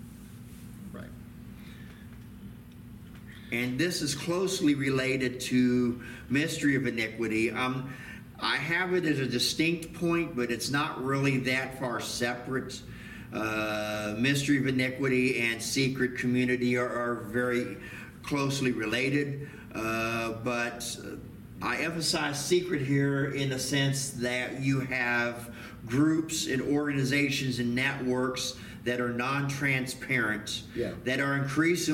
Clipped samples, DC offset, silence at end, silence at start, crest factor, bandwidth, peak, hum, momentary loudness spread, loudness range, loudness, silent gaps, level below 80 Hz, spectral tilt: under 0.1%; under 0.1%; 0 s; 0 s; 16 dB; 17 kHz; -14 dBFS; none; 17 LU; 3 LU; -29 LUFS; none; -56 dBFS; -4.5 dB/octave